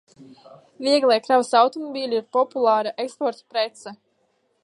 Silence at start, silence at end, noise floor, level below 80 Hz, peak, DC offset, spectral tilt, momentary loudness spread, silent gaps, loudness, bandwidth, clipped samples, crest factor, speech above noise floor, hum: 0.2 s; 0.7 s; -68 dBFS; -82 dBFS; -4 dBFS; under 0.1%; -3 dB/octave; 11 LU; none; -21 LUFS; 11.5 kHz; under 0.1%; 18 dB; 46 dB; none